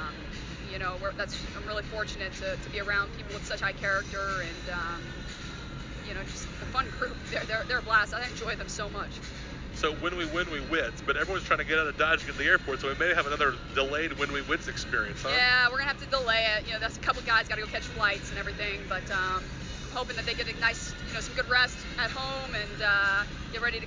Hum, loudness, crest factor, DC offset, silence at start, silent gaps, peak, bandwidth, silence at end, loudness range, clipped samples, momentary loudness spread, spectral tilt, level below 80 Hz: none; -29 LUFS; 20 dB; under 0.1%; 0 s; none; -10 dBFS; 7.6 kHz; 0 s; 7 LU; under 0.1%; 13 LU; -3.5 dB/octave; -44 dBFS